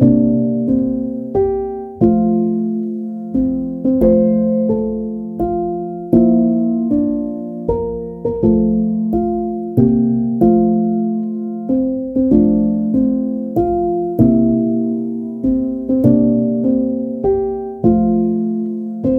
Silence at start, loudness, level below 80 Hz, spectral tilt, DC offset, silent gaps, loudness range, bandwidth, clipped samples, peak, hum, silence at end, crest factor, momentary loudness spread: 0 s; -16 LUFS; -38 dBFS; -13 dB/octave; under 0.1%; none; 2 LU; 2.1 kHz; under 0.1%; 0 dBFS; none; 0 s; 16 dB; 9 LU